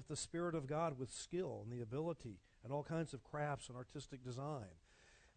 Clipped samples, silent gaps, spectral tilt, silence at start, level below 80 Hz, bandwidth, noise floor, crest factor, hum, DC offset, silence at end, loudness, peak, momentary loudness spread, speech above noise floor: under 0.1%; none; -5.5 dB/octave; 0 s; -70 dBFS; 9 kHz; -69 dBFS; 16 dB; none; under 0.1%; 0.1 s; -46 LUFS; -30 dBFS; 10 LU; 24 dB